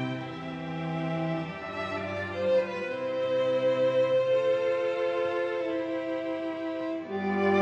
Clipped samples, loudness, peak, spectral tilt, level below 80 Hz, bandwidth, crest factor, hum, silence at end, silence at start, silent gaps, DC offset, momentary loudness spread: under 0.1%; -29 LUFS; -14 dBFS; -7 dB/octave; -68 dBFS; 7.8 kHz; 14 dB; none; 0 s; 0 s; none; under 0.1%; 9 LU